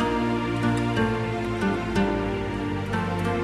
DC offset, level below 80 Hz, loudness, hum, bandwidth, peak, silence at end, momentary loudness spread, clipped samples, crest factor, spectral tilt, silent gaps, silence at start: under 0.1%; -40 dBFS; -26 LUFS; none; 13 kHz; -10 dBFS; 0 s; 4 LU; under 0.1%; 14 dB; -7 dB/octave; none; 0 s